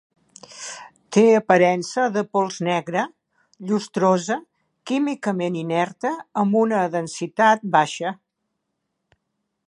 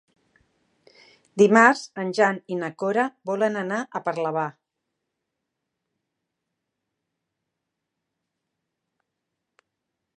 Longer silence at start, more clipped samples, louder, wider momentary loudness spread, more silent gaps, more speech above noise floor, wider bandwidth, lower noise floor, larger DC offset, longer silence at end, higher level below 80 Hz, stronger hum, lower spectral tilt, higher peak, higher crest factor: second, 0.5 s vs 1.35 s; neither; about the same, -21 LUFS vs -22 LUFS; first, 16 LU vs 13 LU; neither; about the same, 57 dB vs 60 dB; about the same, 11 kHz vs 10.5 kHz; second, -77 dBFS vs -82 dBFS; neither; second, 1.55 s vs 5.65 s; first, -74 dBFS vs -80 dBFS; neither; about the same, -5.5 dB/octave vs -5.5 dB/octave; about the same, 0 dBFS vs -2 dBFS; about the same, 22 dB vs 26 dB